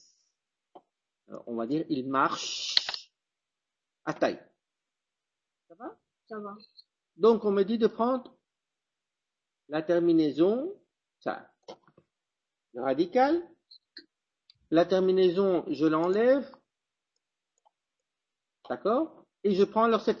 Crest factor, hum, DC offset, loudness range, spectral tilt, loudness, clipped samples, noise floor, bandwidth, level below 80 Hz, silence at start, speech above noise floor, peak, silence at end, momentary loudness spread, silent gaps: 26 dB; none; under 0.1%; 8 LU; -5.5 dB/octave; -27 LUFS; under 0.1%; -89 dBFS; 7.4 kHz; -72 dBFS; 1.3 s; 63 dB; -4 dBFS; 0 s; 18 LU; none